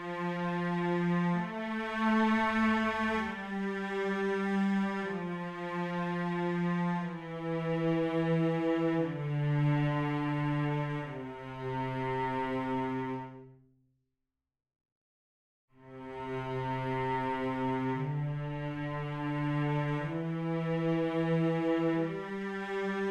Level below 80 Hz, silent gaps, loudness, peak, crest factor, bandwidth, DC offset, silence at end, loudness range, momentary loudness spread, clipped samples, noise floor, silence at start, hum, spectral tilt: -62 dBFS; 14.92-15.68 s; -33 LUFS; -18 dBFS; 14 dB; 8.8 kHz; under 0.1%; 0 s; 8 LU; 8 LU; under 0.1%; -87 dBFS; 0 s; none; -8 dB/octave